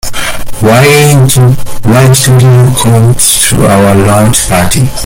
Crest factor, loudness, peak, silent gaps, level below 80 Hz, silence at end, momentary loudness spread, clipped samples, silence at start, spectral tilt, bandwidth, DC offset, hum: 4 dB; -5 LUFS; 0 dBFS; none; -24 dBFS; 0 s; 6 LU; 3%; 0.05 s; -4.5 dB/octave; over 20 kHz; under 0.1%; none